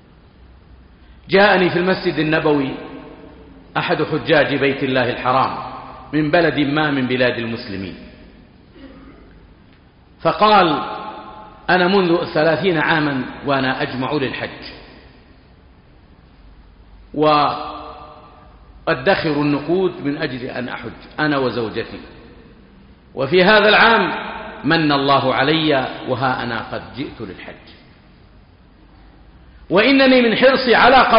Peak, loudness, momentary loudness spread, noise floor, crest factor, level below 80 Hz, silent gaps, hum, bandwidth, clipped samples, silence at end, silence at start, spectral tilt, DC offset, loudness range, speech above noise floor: -2 dBFS; -16 LUFS; 19 LU; -48 dBFS; 16 dB; -46 dBFS; none; none; 5.4 kHz; under 0.1%; 0 s; 1.25 s; -3 dB/octave; under 0.1%; 9 LU; 32 dB